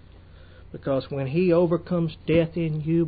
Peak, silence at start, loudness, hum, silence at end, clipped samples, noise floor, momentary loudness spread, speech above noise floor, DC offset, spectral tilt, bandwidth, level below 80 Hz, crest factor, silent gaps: -10 dBFS; 0.35 s; -24 LUFS; none; 0 s; under 0.1%; -47 dBFS; 7 LU; 24 dB; under 0.1%; -12.5 dB/octave; 4.9 kHz; -48 dBFS; 14 dB; none